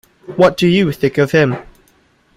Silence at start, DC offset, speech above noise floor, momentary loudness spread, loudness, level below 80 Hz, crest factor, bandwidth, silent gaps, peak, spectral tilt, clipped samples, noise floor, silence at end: 0.3 s; under 0.1%; 41 dB; 11 LU; -14 LUFS; -48 dBFS; 14 dB; 15.5 kHz; none; 0 dBFS; -6.5 dB/octave; under 0.1%; -54 dBFS; 0.75 s